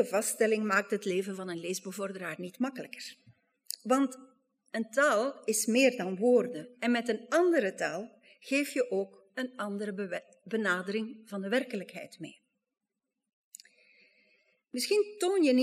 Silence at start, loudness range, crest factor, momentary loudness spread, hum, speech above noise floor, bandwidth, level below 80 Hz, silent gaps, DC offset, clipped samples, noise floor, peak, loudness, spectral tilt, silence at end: 0 s; 9 LU; 20 dB; 15 LU; none; 56 dB; 15.5 kHz; under -90 dBFS; 13.33-13.52 s; under 0.1%; under 0.1%; -87 dBFS; -12 dBFS; -31 LUFS; -3.5 dB/octave; 0 s